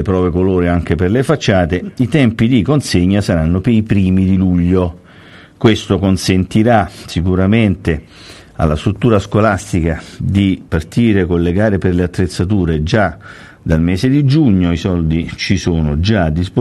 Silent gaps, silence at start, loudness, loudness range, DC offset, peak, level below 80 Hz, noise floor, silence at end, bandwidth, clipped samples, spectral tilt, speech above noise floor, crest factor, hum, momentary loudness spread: none; 0 s; -14 LUFS; 2 LU; under 0.1%; 0 dBFS; -32 dBFS; -39 dBFS; 0 s; 12.5 kHz; under 0.1%; -7 dB/octave; 26 dB; 14 dB; none; 6 LU